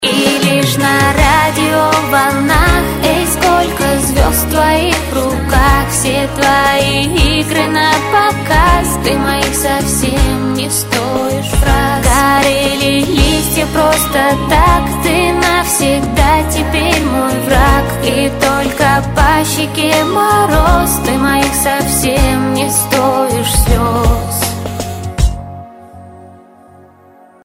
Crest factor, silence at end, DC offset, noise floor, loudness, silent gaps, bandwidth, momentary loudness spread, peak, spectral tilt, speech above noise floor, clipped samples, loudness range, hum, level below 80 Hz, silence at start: 12 dB; 1.1 s; under 0.1%; -42 dBFS; -11 LUFS; none; 16.5 kHz; 4 LU; 0 dBFS; -4 dB/octave; 31 dB; under 0.1%; 2 LU; none; -20 dBFS; 0 s